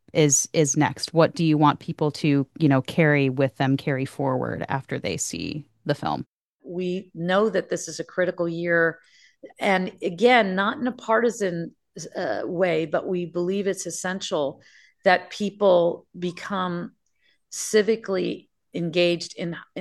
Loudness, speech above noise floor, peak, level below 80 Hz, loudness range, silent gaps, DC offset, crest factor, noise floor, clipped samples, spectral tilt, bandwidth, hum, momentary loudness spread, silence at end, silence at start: -24 LUFS; 45 dB; -4 dBFS; -64 dBFS; 6 LU; 6.28-6.59 s; under 0.1%; 20 dB; -68 dBFS; under 0.1%; -4.5 dB/octave; 12.5 kHz; none; 12 LU; 0 s; 0.15 s